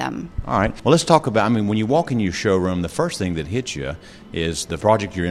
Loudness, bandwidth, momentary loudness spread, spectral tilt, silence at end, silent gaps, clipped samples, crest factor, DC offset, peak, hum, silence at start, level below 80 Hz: -20 LUFS; 14.5 kHz; 11 LU; -5.5 dB/octave; 0 s; none; under 0.1%; 20 dB; under 0.1%; 0 dBFS; none; 0 s; -40 dBFS